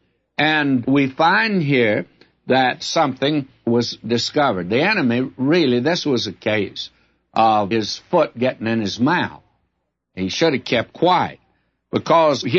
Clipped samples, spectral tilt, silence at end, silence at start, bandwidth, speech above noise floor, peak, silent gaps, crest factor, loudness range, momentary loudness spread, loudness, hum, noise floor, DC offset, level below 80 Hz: under 0.1%; -5 dB/octave; 0 s; 0.4 s; 8 kHz; 55 dB; -2 dBFS; none; 16 dB; 3 LU; 10 LU; -19 LUFS; none; -73 dBFS; under 0.1%; -60 dBFS